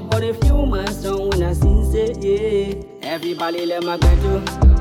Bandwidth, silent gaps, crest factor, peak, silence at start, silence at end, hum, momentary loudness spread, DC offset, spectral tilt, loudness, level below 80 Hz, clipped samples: 14 kHz; none; 14 dB; -4 dBFS; 0 s; 0 s; none; 7 LU; under 0.1%; -7 dB/octave; -19 LUFS; -20 dBFS; under 0.1%